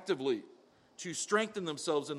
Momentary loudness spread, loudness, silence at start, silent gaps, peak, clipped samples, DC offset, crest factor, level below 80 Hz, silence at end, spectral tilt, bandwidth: 8 LU; -35 LUFS; 0 s; none; -16 dBFS; under 0.1%; under 0.1%; 18 dB; -84 dBFS; 0 s; -3.5 dB/octave; 13 kHz